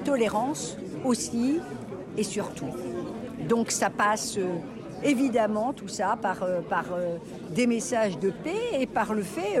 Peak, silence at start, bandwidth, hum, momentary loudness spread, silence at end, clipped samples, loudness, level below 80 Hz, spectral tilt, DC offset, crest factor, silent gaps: -14 dBFS; 0 s; 15.5 kHz; none; 10 LU; 0 s; under 0.1%; -28 LUFS; -60 dBFS; -4.5 dB/octave; under 0.1%; 14 dB; none